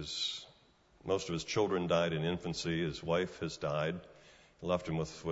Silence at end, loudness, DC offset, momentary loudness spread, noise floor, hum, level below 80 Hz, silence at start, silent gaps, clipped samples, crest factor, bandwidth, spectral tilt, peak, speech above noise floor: 0 s; -35 LUFS; under 0.1%; 7 LU; -66 dBFS; none; -60 dBFS; 0 s; none; under 0.1%; 18 dB; 7.6 kHz; -4.5 dB/octave; -18 dBFS; 31 dB